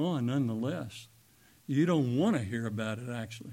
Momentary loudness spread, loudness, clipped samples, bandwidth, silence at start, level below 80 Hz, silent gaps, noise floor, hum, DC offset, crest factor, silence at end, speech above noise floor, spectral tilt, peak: 13 LU; -32 LUFS; under 0.1%; 16.5 kHz; 0 s; -70 dBFS; none; -62 dBFS; none; under 0.1%; 16 dB; 0 s; 31 dB; -7 dB/octave; -16 dBFS